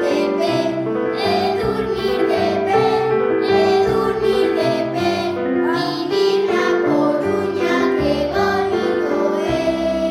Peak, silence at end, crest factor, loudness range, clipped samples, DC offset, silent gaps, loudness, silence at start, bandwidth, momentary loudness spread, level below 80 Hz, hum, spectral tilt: -4 dBFS; 0 s; 14 dB; 1 LU; under 0.1%; under 0.1%; none; -18 LUFS; 0 s; 14 kHz; 4 LU; -44 dBFS; none; -6 dB/octave